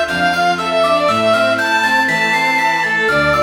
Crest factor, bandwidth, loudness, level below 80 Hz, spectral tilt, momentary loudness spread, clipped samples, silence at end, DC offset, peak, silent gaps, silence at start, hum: 12 dB; 19.5 kHz; -13 LUFS; -44 dBFS; -3.5 dB/octave; 2 LU; under 0.1%; 0 s; under 0.1%; -2 dBFS; none; 0 s; none